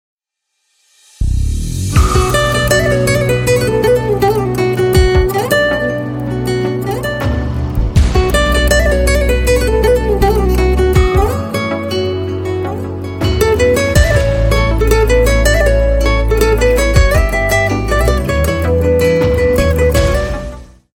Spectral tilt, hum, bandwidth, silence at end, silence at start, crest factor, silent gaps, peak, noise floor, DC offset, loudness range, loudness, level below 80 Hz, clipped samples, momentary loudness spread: -5.5 dB/octave; none; 17 kHz; 0.3 s; 1.2 s; 12 dB; none; 0 dBFS; -70 dBFS; under 0.1%; 3 LU; -13 LUFS; -16 dBFS; under 0.1%; 7 LU